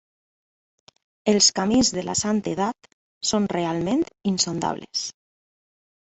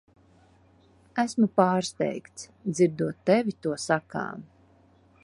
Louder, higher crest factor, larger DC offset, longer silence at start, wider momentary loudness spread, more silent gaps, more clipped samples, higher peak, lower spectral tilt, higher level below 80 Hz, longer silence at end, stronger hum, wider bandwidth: first, -22 LUFS vs -27 LUFS; about the same, 20 dB vs 22 dB; neither; about the same, 1.25 s vs 1.15 s; about the same, 11 LU vs 13 LU; first, 2.93-3.21 s vs none; neither; about the same, -4 dBFS vs -6 dBFS; second, -3.5 dB/octave vs -5.5 dB/octave; first, -56 dBFS vs -66 dBFS; first, 1 s vs 0.8 s; neither; second, 8.4 kHz vs 11.5 kHz